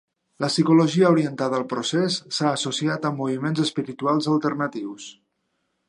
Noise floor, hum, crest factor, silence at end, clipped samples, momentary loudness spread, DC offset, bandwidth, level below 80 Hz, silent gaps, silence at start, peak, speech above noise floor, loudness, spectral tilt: -74 dBFS; none; 18 dB; 0.75 s; under 0.1%; 11 LU; under 0.1%; 11 kHz; -72 dBFS; none; 0.4 s; -4 dBFS; 52 dB; -22 LUFS; -5.5 dB/octave